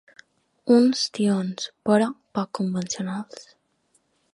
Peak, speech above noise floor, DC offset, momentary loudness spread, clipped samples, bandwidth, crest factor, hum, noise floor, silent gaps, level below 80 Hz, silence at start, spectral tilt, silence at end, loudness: -6 dBFS; 45 dB; under 0.1%; 16 LU; under 0.1%; 11.5 kHz; 20 dB; none; -68 dBFS; none; -70 dBFS; 0.65 s; -5 dB/octave; 0.9 s; -23 LUFS